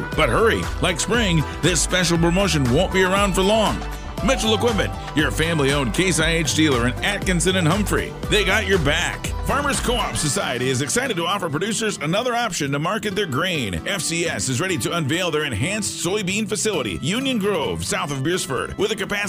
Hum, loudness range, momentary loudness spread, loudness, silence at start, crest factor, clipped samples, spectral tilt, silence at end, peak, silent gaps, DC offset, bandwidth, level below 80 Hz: none; 3 LU; 5 LU; -20 LUFS; 0 s; 16 dB; under 0.1%; -4 dB/octave; 0 s; -4 dBFS; none; under 0.1%; 16 kHz; -34 dBFS